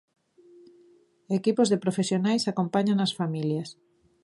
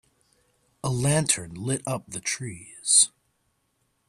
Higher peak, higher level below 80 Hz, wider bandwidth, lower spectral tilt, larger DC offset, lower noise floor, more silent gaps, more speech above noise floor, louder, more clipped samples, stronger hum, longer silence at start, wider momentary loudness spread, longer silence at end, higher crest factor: second, -10 dBFS vs -4 dBFS; second, -74 dBFS vs -58 dBFS; second, 11.5 kHz vs 14 kHz; first, -6 dB/octave vs -3 dB/octave; neither; second, -60 dBFS vs -72 dBFS; neither; second, 34 dB vs 47 dB; about the same, -26 LUFS vs -24 LUFS; neither; neither; first, 1.3 s vs 0.85 s; second, 7 LU vs 15 LU; second, 0.5 s vs 1 s; second, 18 dB vs 24 dB